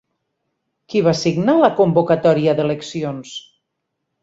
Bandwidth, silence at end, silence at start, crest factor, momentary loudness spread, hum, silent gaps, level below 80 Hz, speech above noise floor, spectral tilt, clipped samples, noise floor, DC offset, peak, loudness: 8 kHz; 0.85 s; 0.9 s; 16 dB; 13 LU; none; none; -58 dBFS; 60 dB; -6.5 dB/octave; under 0.1%; -76 dBFS; under 0.1%; -2 dBFS; -17 LUFS